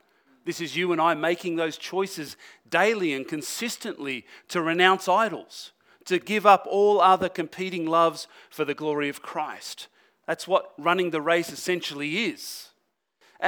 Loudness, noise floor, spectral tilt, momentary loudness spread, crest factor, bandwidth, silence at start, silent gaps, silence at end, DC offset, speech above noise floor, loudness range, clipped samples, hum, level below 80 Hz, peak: -25 LUFS; -73 dBFS; -4 dB/octave; 19 LU; 24 dB; over 20 kHz; 0.45 s; none; 0 s; under 0.1%; 48 dB; 6 LU; under 0.1%; none; -74 dBFS; -2 dBFS